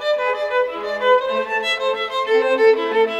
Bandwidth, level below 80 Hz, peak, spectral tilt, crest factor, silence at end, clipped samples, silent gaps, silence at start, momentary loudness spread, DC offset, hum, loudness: 10.5 kHz; -62 dBFS; -4 dBFS; -2.5 dB/octave; 14 dB; 0 s; under 0.1%; none; 0 s; 6 LU; under 0.1%; none; -18 LUFS